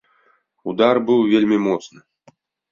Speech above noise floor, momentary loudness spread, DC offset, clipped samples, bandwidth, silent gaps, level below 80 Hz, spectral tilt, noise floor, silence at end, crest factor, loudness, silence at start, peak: 44 dB; 12 LU; under 0.1%; under 0.1%; 7.2 kHz; none; -62 dBFS; -6.5 dB/octave; -61 dBFS; 0.85 s; 18 dB; -18 LUFS; 0.65 s; -2 dBFS